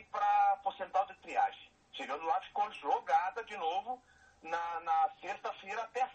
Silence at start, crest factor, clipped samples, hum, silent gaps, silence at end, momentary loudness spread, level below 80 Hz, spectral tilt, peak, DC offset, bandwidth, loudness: 0 s; 16 dB; under 0.1%; none; none; 0 s; 12 LU; -76 dBFS; -2.5 dB/octave; -20 dBFS; under 0.1%; 8.4 kHz; -35 LUFS